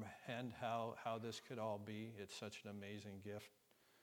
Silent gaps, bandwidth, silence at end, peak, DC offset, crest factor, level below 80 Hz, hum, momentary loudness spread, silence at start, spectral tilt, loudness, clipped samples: none; 19 kHz; 0 s; -30 dBFS; under 0.1%; 20 dB; -86 dBFS; none; 8 LU; 0 s; -5 dB/octave; -49 LUFS; under 0.1%